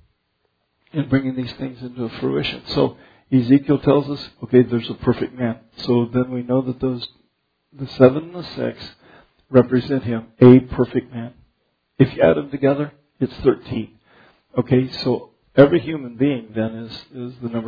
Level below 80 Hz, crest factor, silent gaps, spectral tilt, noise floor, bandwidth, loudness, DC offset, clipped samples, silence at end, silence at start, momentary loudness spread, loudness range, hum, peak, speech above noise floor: -48 dBFS; 20 dB; none; -9.5 dB/octave; -70 dBFS; 5 kHz; -19 LUFS; under 0.1%; under 0.1%; 0 s; 0.95 s; 16 LU; 5 LU; none; 0 dBFS; 51 dB